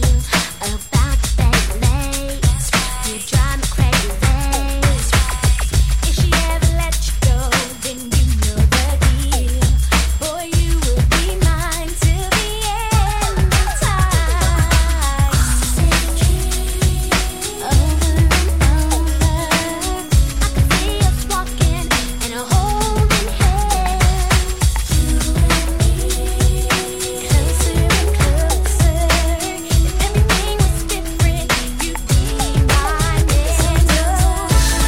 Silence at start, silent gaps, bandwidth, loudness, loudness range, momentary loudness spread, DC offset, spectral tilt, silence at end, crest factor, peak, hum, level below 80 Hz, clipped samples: 0 s; none; 16.5 kHz; -17 LUFS; 1 LU; 4 LU; 1%; -4 dB/octave; 0 s; 14 dB; 0 dBFS; none; -18 dBFS; under 0.1%